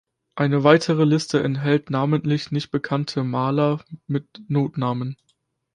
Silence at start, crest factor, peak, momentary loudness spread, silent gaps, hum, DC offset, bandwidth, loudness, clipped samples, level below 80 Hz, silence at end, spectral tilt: 0.35 s; 20 dB; -2 dBFS; 12 LU; none; none; under 0.1%; 10.5 kHz; -22 LUFS; under 0.1%; -60 dBFS; 0.6 s; -7 dB/octave